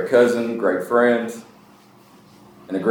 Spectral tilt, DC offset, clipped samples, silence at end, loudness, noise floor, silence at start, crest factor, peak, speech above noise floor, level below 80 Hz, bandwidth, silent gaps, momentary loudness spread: -5.5 dB/octave; under 0.1%; under 0.1%; 0 s; -20 LUFS; -49 dBFS; 0 s; 18 dB; -2 dBFS; 31 dB; -72 dBFS; 19 kHz; none; 14 LU